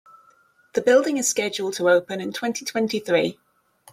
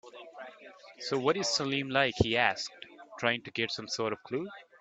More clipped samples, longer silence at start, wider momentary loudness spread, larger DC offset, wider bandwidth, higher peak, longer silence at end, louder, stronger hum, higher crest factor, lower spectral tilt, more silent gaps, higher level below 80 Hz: neither; first, 0.75 s vs 0.05 s; second, 9 LU vs 21 LU; neither; first, 16 kHz vs 9.2 kHz; about the same, -6 dBFS vs -8 dBFS; first, 0.6 s vs 0.2 s; first, -22 LUFS vs -31 LUFS; neither; second, 18 dB vs 24 dB; about the same, -3 dB/octave vs -3.5 dB/octave; neither; second, -70 dBFS vs -58 dBFS